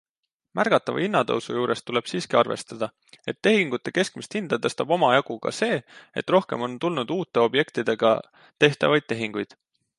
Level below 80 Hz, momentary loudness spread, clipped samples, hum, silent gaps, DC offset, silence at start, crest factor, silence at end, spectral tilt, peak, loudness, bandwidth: -70 dBFS; 11 LU; under 0.1%; none; none; under 0.1%; 0.55 s; 22 dB; 0.55 s; -5 dB/octave; -4 dBFS; -24 LUFS; 11.5 kHz